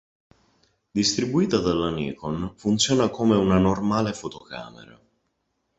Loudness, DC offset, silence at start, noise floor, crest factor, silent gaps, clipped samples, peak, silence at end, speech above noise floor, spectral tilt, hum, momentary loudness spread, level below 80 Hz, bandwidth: -23 LUFS; under 0.1%; 0.95 s; -75 dBFS; 20 dB; none; under 0.1%; -4 dBFS; 0.95 s; 52 dB; -5 dB/octave; none; 15 LU; -48 dBFS; 8.2 kHz